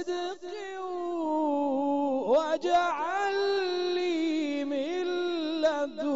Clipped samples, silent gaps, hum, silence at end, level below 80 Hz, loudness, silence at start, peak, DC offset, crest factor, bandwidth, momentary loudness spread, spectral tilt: under 0.1%; none; none; 0 s; -70 dBFS; -29 LUFS; 0 s; -14 dBFS; 0.2%; 14 dB; 7.6 kHz; 8 LU; -1 dB/octave